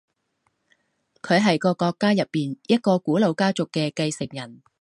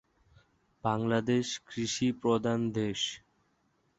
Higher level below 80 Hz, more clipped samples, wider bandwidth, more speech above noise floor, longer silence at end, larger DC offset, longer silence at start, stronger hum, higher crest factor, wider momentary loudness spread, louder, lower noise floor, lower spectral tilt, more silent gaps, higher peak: about the same, -66 dBFS vs -64 dBFS; neither; first, 11.5 kHz vs 8.2 kHz; first, 50 dB vs 43 dB; second, 0.25 s vs 0.8 s; neither; first, 1.25 s vs 0.85 s; neither; about the same, 18 dB vs 20 dB; first, 12 LU vs 7 LU; first, -22 LUFS vs -31 LUFS; about the same, -72 dBFS vs -73 dBFS; about the same, -5.5 dB/octave vs -5 dB/octave; neither; first, -6 dBFS vs -14 dBFS